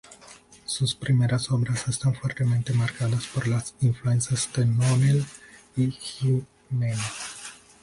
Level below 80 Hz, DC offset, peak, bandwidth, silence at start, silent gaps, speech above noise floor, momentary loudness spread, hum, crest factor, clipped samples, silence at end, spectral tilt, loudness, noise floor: -54 dBFS; under 0.1%; -12 dBFS; 11.5 kHz; 0.1 s; none; 26 dB; 12 LU; none; 14 dB; under 0.1%; 0.3 s; -5.5 dB/octave; -25 LUFS; -50 dBFS